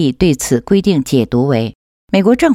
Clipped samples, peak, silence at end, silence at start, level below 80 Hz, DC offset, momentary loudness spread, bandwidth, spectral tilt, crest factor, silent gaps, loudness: under 0.1%; 0 dBFS; 0 s; 0 s; -38 dBFS; under 0.1%; 5 LU; 16 kHz; -6 dB/octave; 12 dB; 1.75-2.08 s; -14 LUFS